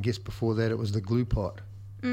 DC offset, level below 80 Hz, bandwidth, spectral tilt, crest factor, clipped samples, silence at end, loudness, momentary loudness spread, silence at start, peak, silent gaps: under 0.1%; -42 dBFS; 14 kHz; -7.5 dB/octave; 16 dB; under 0.1%; 0 s; -30 LUFS; 11 LU; 0 s; -14 dBFS; none